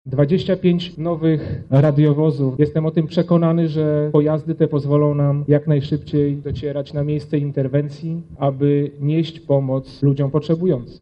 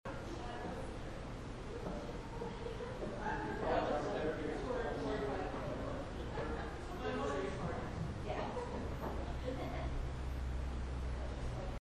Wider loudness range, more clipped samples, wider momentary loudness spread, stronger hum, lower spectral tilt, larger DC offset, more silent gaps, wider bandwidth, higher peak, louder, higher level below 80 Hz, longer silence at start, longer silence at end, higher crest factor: about the same, 4 LU vs 3 LU; neither; about the same, 7 LU vs 7 LU; neither; first, -10 dB/octave vs -6.5 dB/octave; neither; neither; second, 5.6 kHz vs 12.5 kHz; first, -4 dBFS vs -24 dBFS; first, -19 LUFS vs -42 LUFS; about the same, -48 dBFS vs -46 dBFS; about the same, 0.05 s vs 0.05 s; about the same, 0.05 s vs 0.05 s; about the same, 14 dB vs 18 dB